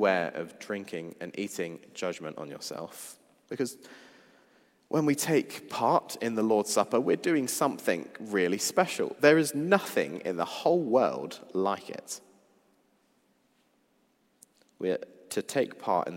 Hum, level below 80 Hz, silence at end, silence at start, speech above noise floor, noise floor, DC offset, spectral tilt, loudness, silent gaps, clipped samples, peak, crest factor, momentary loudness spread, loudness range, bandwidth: none; -82 dBFS; 0 s; 0 s; 41 dB; -70 dBFS; under 0.1%; -4 dB/octave; -29 LUFS; none; under 0.1%; -6 dBFS; 24 dB; 14 LU; 12 LU; 16 kHz